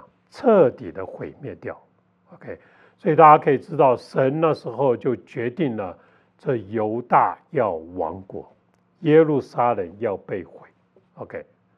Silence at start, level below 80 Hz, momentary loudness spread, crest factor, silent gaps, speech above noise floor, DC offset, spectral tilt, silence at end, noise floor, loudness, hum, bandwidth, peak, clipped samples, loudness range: 0.35 s; -70 dBFS; 20 LU; 22 dB; none; 34 dB; under 0.1%; -9 dB/octave; 0.35 s; -55 dBFS; -20 LUFS; none; 6.4 kHz; 0 dBFS; under 0.1%; 6 LU